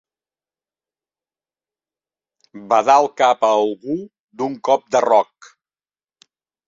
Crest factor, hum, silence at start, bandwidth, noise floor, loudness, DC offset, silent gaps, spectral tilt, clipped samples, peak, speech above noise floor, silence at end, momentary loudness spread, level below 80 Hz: 20 dB; 50 Hz at -70 dBFS; 2.55 s; 7.8 kHz; under -90 dBFS; -17 LUFS; under 0.1%; 4.19-4.28 s; -4 dB/octave; under 0.1%; -2 dBFS; over 73 dB; 1.45 s; 13 LU; -68 dBFS